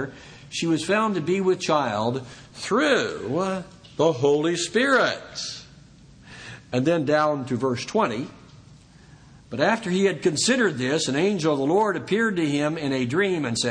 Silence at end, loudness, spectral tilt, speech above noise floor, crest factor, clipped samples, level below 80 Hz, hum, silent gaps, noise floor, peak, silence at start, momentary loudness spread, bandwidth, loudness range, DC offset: 0 s; -23 LUFS; -4.5 dB/octave; 27 dB; 18 dB; under 0.1%; -60 dBFS; none; none; -49 dBFS; -6 dBFS; 0 s; 13 LU; 10 kHz; 4 LU; under 0.1%